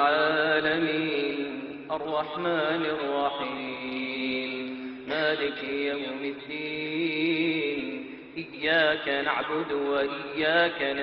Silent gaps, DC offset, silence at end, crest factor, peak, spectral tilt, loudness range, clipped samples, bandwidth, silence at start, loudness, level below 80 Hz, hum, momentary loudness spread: none; under 0.1%; 0 s; 18 dB; -10 dBFS; -7.5 dB/octave; 3 LU; under 0.1%; 5.8 kHz; 0 s; -28 LUFS; -66 dBFS; none; 11 LU